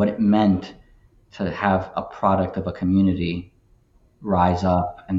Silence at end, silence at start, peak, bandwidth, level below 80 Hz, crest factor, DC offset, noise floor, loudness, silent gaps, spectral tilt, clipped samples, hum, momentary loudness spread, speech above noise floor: 0 s; 0 s; -4 dBFS; 7.6 kHz; -46 dBFS; 18 dB; under 0.1%; -57 dBFS; -22 LUFS; none; -8.5 dB/octave; under 0.1%; none; 11 LU; 36 dB